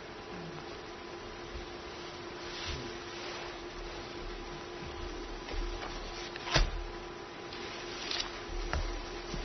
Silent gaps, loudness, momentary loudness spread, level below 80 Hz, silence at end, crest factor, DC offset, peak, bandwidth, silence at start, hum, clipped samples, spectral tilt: none; -40 LUFS; 9 LU; -44 dBFS; 0 s; 28 dB; under 0.1%; -12 dBFS; 6.2 kHz; 0 s; none; under 0.1%; -2.5 dB/octave